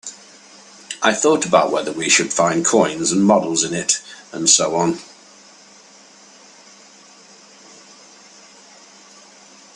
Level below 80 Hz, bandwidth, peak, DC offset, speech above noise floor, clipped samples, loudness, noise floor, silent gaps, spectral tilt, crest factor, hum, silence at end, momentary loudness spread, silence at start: -64 dBFS; 11.5 kHz; 0 dBFS; under 0.1%; 29 dB; under 0.1%; -16 LUFS; -46 dBFS; none; -2.5 dB/octave; 20 dB; none; 4.7 s; 8 LU; 0.05 s